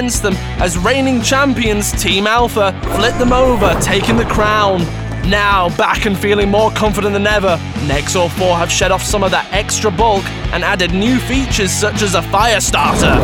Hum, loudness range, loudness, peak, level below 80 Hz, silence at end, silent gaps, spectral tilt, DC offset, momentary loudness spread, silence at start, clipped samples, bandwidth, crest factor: none; 1 LU; -13 LUFS; 0 dBFS; -24 dBFS; 0 s; none; -4 dB/octave; under 0.1%; 4 LU; 0 s; under 0.1%; 19 kHz; 12 dB